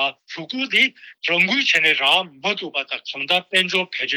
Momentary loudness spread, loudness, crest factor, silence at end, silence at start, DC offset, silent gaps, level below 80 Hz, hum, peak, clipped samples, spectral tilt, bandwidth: 11 LU; -18 LUFS; 14 dB; 0 s; 0 s; under 0.1%; none; -72 dBFS; none; -6 dBFS; under 0.1%; -2.5 dB/octave; over 20 kHz